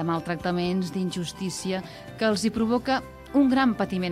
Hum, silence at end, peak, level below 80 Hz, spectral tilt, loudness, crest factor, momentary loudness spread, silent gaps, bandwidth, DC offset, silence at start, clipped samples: none; 0 s; -10 dBFS; -52 dBFS; -5.5 dB/octave; -26 LUFS; 16 dB; 9 LU; none; 15 kHz; under 0.1%; 0 s; under 0.1%